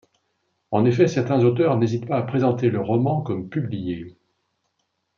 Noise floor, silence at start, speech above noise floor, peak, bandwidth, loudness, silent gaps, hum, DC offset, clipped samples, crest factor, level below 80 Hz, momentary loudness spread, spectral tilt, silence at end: -74 dBFS; 0.7 s; 53 dB; -4 dBFS; 7 kHz; -21 LUFS; none; none; under 0.1%; under 0.1%; 18 dB; -62 dBFS; 10 LU; -8.5 dB/octave; 1.1 s